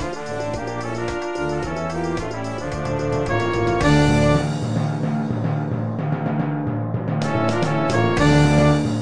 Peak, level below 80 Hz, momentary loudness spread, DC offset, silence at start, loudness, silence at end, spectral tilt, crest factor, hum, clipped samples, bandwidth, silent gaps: -4 dBFS; -36 dBFS; 10 LU; 1%; 0 s; -21 LUFS; 0 s; -6.5 dB/octave; 16 dB; none; under 0.1%; 10.5 kHz; none